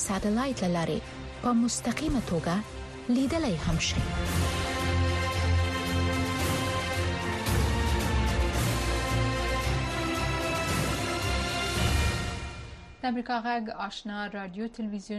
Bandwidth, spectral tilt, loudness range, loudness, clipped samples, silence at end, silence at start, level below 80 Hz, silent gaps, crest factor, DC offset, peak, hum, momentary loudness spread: 13.5 kHz; -5 dB/octave; 2 LU; -29 LUFS; under 0.1%; 0 s; 0 s; -36 dBFS; none; 16 dB; under 0.1%; -14 dBFS; none; 8 LU